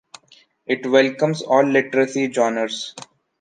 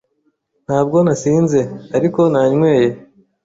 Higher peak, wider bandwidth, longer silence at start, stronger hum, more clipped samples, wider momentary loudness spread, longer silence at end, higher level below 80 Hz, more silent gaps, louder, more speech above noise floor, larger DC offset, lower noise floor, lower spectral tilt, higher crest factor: about the same, -2 dBFS vs -2 dBFS; first, 9.6 kHz vs 8 kHz; about the same, 0.7 s vs 0.7 s; neither; neither; first, 14 LU vs 7 LU; about the same, 0.35 s vs 0.45 s; second, -74 dBFS vs -54 dBFS; neither; second, -19 LUFS vs -15 LUFS; second, 36 dB vs 51 dB; neither; second, -54 dBFS vs -65 dBFS; second, -4.5 dB/octave vs -7.5 dB/octave; first, 18 dB vs 12 dB